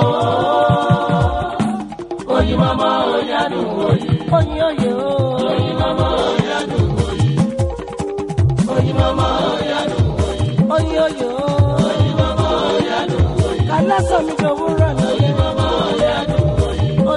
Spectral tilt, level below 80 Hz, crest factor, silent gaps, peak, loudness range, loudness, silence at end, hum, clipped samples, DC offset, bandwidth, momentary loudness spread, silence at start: -7 dB/octave; -30 dBFS; 14 dB; none; 0 dBFS; 1 LU; -17 LUFS; 0 s; none; under 0.1%; under 0.1%; 11.5 kHz; 4 LU; 0 s